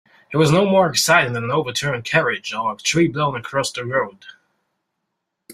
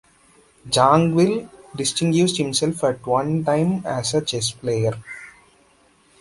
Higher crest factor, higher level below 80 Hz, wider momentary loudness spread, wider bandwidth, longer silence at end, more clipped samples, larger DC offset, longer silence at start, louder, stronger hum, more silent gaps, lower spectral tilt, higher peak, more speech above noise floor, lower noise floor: about the same, 18 dB vs 20 dB; about the same, -56 dBFS vs -54 dBFS; about the same, 8 LU vs 10 LU; first, 16 kHz vs 11.5 kHz; second, 0 s vs 0.9 s; neither; neither; second, 0.3 s vs 0.65 s; about the same, -19 LUFS vs -20 LUFS; neither; neither; about the same, -4 dB/octave vs -5 dB/octave; about the same, -2 dBFS vs -2 dBFS; first, 59 dB vs 37 dB; first, -77 dBFS vs -57 dBFS